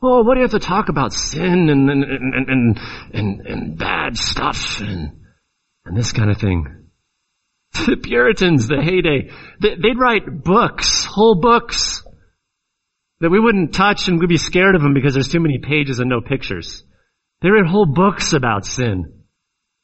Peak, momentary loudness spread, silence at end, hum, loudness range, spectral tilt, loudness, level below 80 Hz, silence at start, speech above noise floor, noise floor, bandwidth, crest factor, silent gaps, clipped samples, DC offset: -2 dBFS; 12 LU; 0.75 s; none; 6 LU; -5 dB/octave; -16 LUFS; -36 dBFS; 0 s; 60 dB; -76 dBFS; 8.2 kHz; 16 dB; none; under 0.1%; under 0.1%